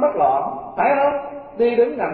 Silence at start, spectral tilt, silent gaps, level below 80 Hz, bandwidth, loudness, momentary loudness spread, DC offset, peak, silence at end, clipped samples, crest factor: 0 s; -10.5 dB/octave; none; -56 dBFS; 4.6 kHz; -19 LUFS; 10 LU; under 0.1%; -6 dBFS; 0 s; under 0.1%; 14 dB